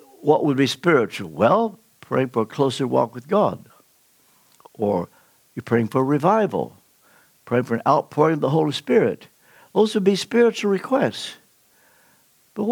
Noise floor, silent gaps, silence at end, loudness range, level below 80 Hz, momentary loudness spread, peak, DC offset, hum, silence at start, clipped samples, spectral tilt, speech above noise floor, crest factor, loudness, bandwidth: -59 dBFS; none; 0 s; 4 LU; -68 dBFS; 10 LU; -4 dBFS; under 0.1%; none; 0.2 s; under 0.1%; -6 dB/octave; 39 dB; 18 dB; -21 LUFS; 19.5 kHz